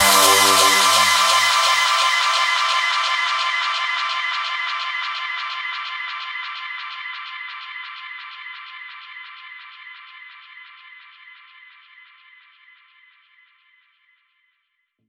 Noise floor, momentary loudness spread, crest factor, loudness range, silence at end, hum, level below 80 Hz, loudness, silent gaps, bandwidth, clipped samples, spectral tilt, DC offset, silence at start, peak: -72 dBFS; 24 LU; 20 dB; 24 LU; 3.75 s; none; -72 dBFS; -17 LUFS; none; 17 kHz; under 0.1%; 1 dB/octave; under 0.1%; 0 s; -2 dBFS